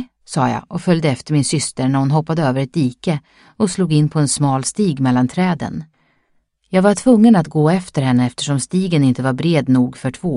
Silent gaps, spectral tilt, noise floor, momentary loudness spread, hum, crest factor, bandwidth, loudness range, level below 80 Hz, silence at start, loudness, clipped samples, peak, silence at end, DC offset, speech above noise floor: none; -6 dB/octave; -62 dBFS; 8 LU; none; 16 dB; 11.5 kHz; 3 LU; -50 dBFS; 0 s; -16 LUFS; under 0.1%; 0 dBFS; 0 s; under 0.1%; 47 dB